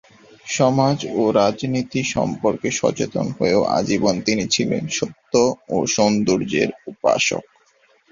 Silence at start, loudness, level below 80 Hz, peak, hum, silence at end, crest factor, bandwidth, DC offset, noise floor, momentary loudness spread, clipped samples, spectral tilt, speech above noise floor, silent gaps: 0.45 s; -20 LUFS; -54 dBFS; -2 dBFS; none; 0.7 s; 18 dB; 7.6 kHz; under 0.1%; -58 dBFS; 6 LU; under 0.1%; -4.5 dB/octave; 39 dB; none